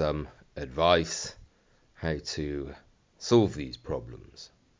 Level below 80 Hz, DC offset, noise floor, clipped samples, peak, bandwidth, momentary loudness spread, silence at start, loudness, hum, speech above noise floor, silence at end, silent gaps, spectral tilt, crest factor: -46 dBFS; under 0.1%; -64 dBFS; under 0.1%; -8 dBFS; 7.6 kHz; 20 LU; 0 s; -29 LUFS; none; 35 dB; 0.35 s; none; -5 dB/octave; 24 dB